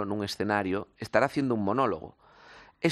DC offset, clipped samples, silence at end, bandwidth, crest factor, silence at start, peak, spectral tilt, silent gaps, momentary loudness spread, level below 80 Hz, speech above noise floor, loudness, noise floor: under 0.1%; under 0.1%; 0 s; 13.5 kHz; 22 dB; 0 s; -8 dBFS; -6 dB/octave; none; 8 LU; -64 dBFS; 25 dB; -29 LUFS; -54 dBFS